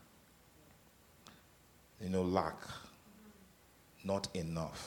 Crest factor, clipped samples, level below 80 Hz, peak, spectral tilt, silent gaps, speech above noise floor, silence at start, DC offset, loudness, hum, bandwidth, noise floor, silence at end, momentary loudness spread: 26 dB; under 0.1%; -66 dBFS; -16 dBFS; -5.5 dB/octave; none; 27 dB; 1.25 s; under 0.1%; -39 LUFS; none; 19 kHz; -65 dBFS; 0 s; 25 LU